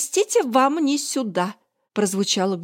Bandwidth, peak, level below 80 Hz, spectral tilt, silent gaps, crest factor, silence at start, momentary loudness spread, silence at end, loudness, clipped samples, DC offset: 16.5 kHz; -6 dBFS; -78 dBFS; -3.5 dB/octave; none; 16 dB; 0 s; 7 LU; 0 s; -21 LUFS; under 0.1%; under 0.1%